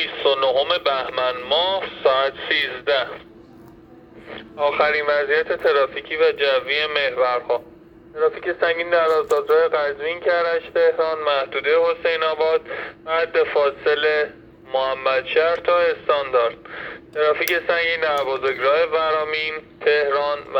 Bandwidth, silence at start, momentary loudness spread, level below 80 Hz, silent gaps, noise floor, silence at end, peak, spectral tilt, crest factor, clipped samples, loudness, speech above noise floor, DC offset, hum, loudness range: 18.5 kHz; 0 s; 6 LU; -58 dBFS; none; -45 dBFS; 0 s; -2 dBFS; -3.5 dB/octave; 18 dB; under 0.1%; -20 LUFS; 25 dB; under 0.1%; none; 3 LU